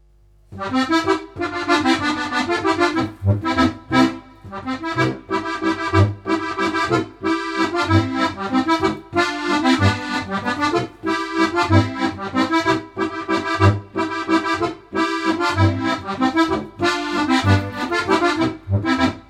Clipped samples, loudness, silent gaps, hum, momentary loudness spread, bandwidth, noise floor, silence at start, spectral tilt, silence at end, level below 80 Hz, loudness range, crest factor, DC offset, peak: under 0.1%; -20 LUFS; none; none; 6 LU; 12 kHz; -52 dBFS; 0.5 s; -6 dB/octave; 0.1 s; -48 dBFS; 1 LU; 18 dB; under 0.1%; -2 dBFS